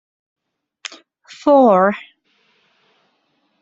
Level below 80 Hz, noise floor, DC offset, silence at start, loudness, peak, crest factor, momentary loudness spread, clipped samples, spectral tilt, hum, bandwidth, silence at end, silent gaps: -66 dBFS; -65 dBFS; under 0.1%; 1.45 s; -14 LUFS; -2 dBFS; 18 dB; 23 LU; under 0.1%; -6.5 dB/octave; none; 7.8 kHz; 1.6 s; none